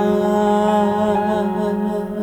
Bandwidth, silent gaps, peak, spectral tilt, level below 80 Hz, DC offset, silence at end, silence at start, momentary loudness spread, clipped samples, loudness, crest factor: 13.5 kHz; none; -6 dBFS; -7 dB/octave; -48 dBFS; under 0.1%; 0 s; 0 s; 5 LU; under 0.1%; -18 LUFS; 12 dB